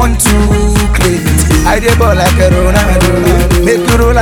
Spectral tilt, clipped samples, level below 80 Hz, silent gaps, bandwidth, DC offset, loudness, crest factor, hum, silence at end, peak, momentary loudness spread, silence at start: -5 dB/octave; 0.5%; -12 dBFS; none; 19.5 kHz; under 0.1%; -9 LUFS; 8 dB; none; 0 s; 0 dBFS; 2 LU; 0 s